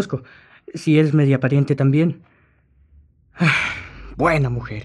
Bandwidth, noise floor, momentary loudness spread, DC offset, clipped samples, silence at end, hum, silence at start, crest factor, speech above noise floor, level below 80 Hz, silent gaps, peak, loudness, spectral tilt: 10.5 kHz; -57 dBFS; 15 LU; under 0.1%; under 0.1%; 0 s; none; 0 s; 16 dB; 39 dB; -44 dBFS; none; -4 dBFS; -18 LUFS; -7.5 dB/octave